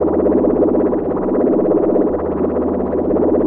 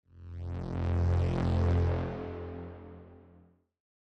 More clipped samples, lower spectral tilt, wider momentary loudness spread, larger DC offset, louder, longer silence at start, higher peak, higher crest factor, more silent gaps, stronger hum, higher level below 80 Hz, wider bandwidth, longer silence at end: neither; first, -13 dB/octave vs -9 dB/octave; second, 4 LU vs 19 LU; neither; first, -16 LUFS vs -32 LUFS; second, 0 s vs 0.15 s; first, -4 dBFS vs -20 dBFS; about the same, 12 dB vs 14 dB; neither; neither; first, -38 dBFS vs -46 dBFS; second, 2.9 kHz vs 6.2 kHz; second, 0 s vs 0.95 s